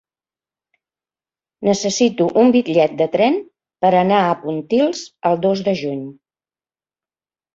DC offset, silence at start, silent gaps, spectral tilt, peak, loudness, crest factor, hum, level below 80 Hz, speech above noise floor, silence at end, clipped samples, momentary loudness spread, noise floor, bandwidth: under 0.1%; 1.6 s; none; -5.5 dB/octave; -2 dBFS; -17 LUFS; 16 dB; none; -62 dBFS; over 74 dB; 1.45 s; under 0.1%; 9 LU; under -90 dBFS; 7.8 kHz